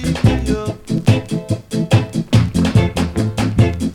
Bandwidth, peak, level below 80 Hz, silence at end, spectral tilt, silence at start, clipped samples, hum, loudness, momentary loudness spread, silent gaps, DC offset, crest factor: 13 kHz; 0 dBFS; -30 dBFS; 0 s; -7 dB/octave; 0 s; under 0.1%; none; -17 LUFS; 7 LU; none; under 0.1%; 16 dB